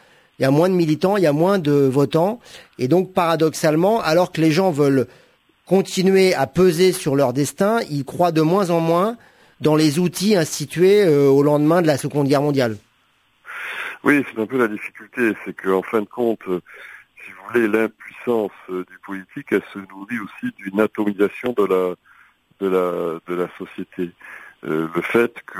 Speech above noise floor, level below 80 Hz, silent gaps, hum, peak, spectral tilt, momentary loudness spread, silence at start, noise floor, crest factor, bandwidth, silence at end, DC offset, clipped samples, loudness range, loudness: 43 dB; -58 dBFS; none; none; -2 dBFS; -6 dB/octave; 15 LU; 0.4 s; -61 dBFS; 18 dB; 16 kHz; 0 s; under 0.1%; under 0.1%; 7 LU; -19 LUFS